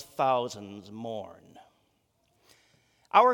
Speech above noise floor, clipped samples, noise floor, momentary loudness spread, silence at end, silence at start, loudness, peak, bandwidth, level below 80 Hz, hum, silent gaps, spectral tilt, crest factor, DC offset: 40 dB; under 0.1%; -72 dBFS; 19 LU; 0 s; 0 s; -29 LUFS; -6 dBFS; 18 kHz; -80 dBFS; none; none; -4.5 dB/octave; 24 dB; under 0.1%